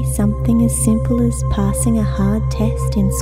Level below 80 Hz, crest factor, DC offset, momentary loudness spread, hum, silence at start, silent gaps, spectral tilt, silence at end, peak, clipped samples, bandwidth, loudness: -22 dBFS; 12 dB; under 0.1%; 3 LU; none; 0 s; none; -7 dB/octave; 0 s; -4 dBFS; under 0.1%; 16 kHz; -17 LUFS